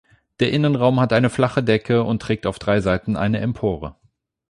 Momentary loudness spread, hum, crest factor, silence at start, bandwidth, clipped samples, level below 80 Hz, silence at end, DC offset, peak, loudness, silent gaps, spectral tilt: 7 LU; none; 16 dB; 0.4 s; 11 kHz; under 0.1%; -44 dBFS; 0.6 s; under 0.1%; -4 dBFS; -20 LUFS; none; -7 dB/octave